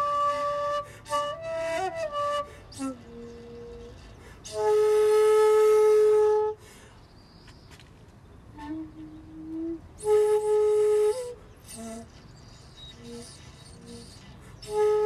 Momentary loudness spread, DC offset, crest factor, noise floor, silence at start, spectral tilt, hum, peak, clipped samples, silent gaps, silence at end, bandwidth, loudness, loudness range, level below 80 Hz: 25 LU; under 0.1%; 14 dB; -51 dBFS; 0 s; -4.5 dB/octave; none; -14 dBFS; under 0.1%; none; 0 s; 13 kHz; -25 LUFS; 18 LU; -56 dBFS